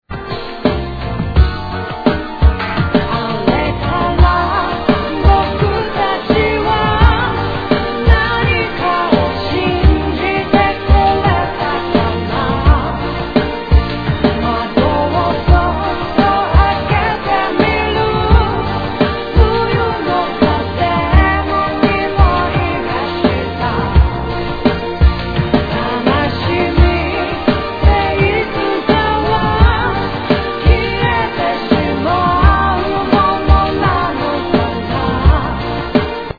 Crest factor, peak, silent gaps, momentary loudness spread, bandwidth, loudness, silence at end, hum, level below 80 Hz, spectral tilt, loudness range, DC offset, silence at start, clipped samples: 14 dB; 0 dBFS; none; 5 LU; 5 kHz; -14 LUFS; 0.05 s; none; -18 dBFS; -8.5 dB/octave; 2 LU; under 0.1%; 0.1 s; 0.2%